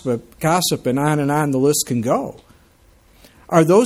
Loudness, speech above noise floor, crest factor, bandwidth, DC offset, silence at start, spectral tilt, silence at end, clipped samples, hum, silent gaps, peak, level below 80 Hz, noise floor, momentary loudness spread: -18 LUFS; 35 dB; 16 dB; 16.5 kHz; under 0.1%; 0.05 s; -5 dB/octave; 0 s; under 0.1%; none; none; -2 dBFS; -52 dBFS; -52 dBFS; 5 LU